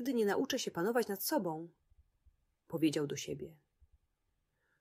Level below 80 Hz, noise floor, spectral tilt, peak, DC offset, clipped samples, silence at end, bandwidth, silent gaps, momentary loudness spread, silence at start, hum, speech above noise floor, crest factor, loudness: -74 dBFS; -82 dBFS; -4.5 dB/octave; -20 dBFS; under 0.1%; under 0.1%; 1.3 s; 16 kHz; none; 13 LU; 0 s; none; 46 dB; 18 dB; -36 LUFS